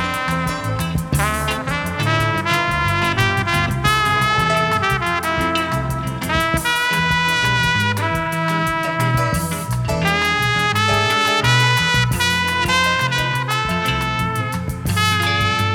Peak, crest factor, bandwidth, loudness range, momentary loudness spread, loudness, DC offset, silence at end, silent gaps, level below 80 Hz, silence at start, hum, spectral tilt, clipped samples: -2 dBFS; 16 dB; 18.5 kHz; 2 LU; 6 LU; -17 LUFS; under 0.1%; 0 s; none; -36 dBFS; 0 s; none; -4 dB/octave; under 0.1%